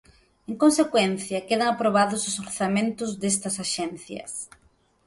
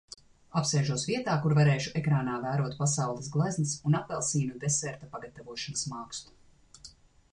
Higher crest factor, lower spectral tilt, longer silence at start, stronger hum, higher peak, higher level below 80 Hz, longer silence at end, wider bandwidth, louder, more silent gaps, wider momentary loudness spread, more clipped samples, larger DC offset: about the same, 18 dB vs 16 dB; second, -3.5 dB/octave vs -5 dB/octave; about the same, 0.5 s vs 0.55 s; neither; first, -8 dBFS vs -14 dBFS; about the same, -62 dBFS vs -62 dBFS; first, 0.6 s vs 0.4 s; about the same, 12 kHz vs 11 kHz; first, -24 LUFS vs -29 LUFS; neither; second, 14 LU vs 17 LU; neither; neither